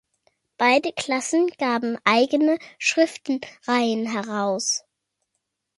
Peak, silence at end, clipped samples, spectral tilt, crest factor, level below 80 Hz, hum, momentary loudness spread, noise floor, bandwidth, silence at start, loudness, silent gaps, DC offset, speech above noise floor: -2 dBFS; 1 s; under 0.1%; -2.5 dB/octave; 20 dB; -72 dBFS; none; 7 LU; -79 dBFS; 11.5 kHz; 0.6 s; -22 LUFS; none; under 0.1%; 56 dB